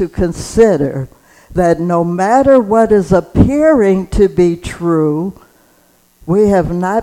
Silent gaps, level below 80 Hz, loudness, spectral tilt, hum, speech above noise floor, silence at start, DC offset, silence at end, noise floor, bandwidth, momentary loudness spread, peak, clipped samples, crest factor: none; -30 dBFS; -12 LUFS; -7.5 dB/octave; none; 40 dB; 0 s; under 0.1%; 0 s; -51 dBFS; 15 kHz; 10 LU; 0 dBFS; 0.2%; 12 dB